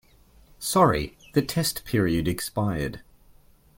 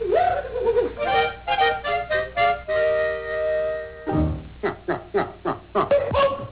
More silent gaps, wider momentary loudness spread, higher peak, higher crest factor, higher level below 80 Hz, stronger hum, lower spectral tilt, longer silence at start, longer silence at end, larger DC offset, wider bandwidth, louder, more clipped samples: neither; first, 11 LU vs 7 LU; first, -6 dBFS vs -12 dBFS; first, 20 dB vs 10 dB; second, -46 dBFS vs -40 dBFS; second, none vs 60 Hz at -50 dBFS; second, -5 dB/octave vs -9 dB/octave; first, 0.6 s vs 0 s; first, 0.8 s vs 0 s; neither; first, 17 kHz vs 4 kHz; about the same, -25 LUFS vs -23 LUFS; neither